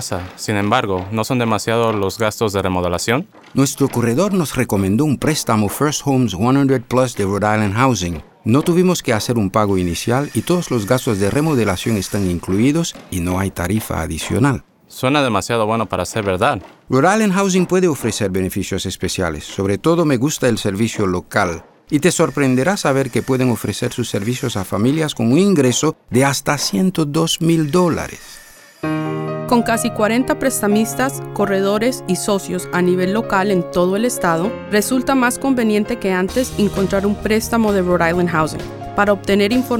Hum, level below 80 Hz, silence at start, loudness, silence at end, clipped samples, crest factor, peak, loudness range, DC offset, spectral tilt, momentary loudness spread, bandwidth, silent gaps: none; -42 dBFS; 0 s; -17 LUFS; 0 s; under 0.1%; 16 dB; -2 dBFS; 2 LU; under 0.1%; -5 dB/octave; 6 LU; 18.5 kHz; none